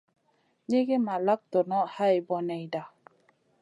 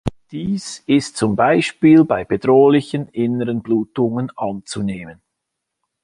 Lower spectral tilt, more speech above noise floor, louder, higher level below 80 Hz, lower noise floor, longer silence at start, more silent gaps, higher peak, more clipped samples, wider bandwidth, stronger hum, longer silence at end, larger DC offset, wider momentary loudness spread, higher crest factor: about the same, -7.5 dB/octave vs -6.5 dB/octave; second, 44 dB vs 62 dB; second, -28 LUFS vs -17 LUFS; second, -84 dBFS vs -48 dBFS; second, -71 dBFS vs -79 dBFS; first, 0.7 s vs 0.05 s; neither; second, -14 dBFS vs -2 dBFS; neither; about the same, 10.5 kHz vs 11 kHz; neither; second, 0.75 s vs 0.9 s; neither; second, 10 LU vs 13 LU; about the same, 16 dB vs 16 dB